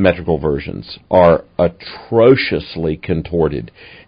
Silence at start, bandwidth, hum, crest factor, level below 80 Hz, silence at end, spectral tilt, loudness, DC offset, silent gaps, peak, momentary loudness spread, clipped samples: 0 s; 5.2 kHz; none; 16 dB; -36 dBFS; 0.4 s; -10 dB/octave; -15 LUFS; under 0.1%; none; 0 dBFS; 16 LU; under 0.1%